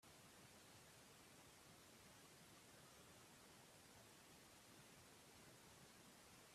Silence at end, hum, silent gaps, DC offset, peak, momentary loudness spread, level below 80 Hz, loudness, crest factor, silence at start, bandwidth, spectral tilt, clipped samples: 0 s; none; none; under 0.1%; -52 dBFS; 0 LU; -86 dBFS; -65 LUFS; 14 dB; 0 s; 15.5 kHz; -2.5 dB/octave; under 0.1%